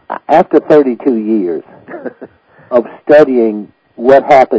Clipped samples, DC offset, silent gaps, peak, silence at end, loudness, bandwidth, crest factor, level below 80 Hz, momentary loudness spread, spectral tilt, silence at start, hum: 3%; under 0.1%; none; 0 dBFS; 0 s; -10 LUFS; 8 kHz; 10 dB; -54 dBFS; 20 LU; -7.5 dB/octave; 0.1 s; none